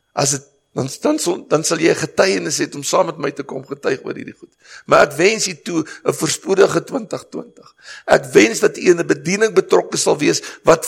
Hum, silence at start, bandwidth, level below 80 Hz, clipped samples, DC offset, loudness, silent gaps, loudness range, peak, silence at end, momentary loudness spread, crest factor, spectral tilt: none; 0.15 s; 16.5 kHz; -56 dBFS; under 0.1%; under 0.1%; -17 LUFS; none; 3 LU; 0 dBFS; 0 s; 15 LU; 18 dB; -3.5 dB/octave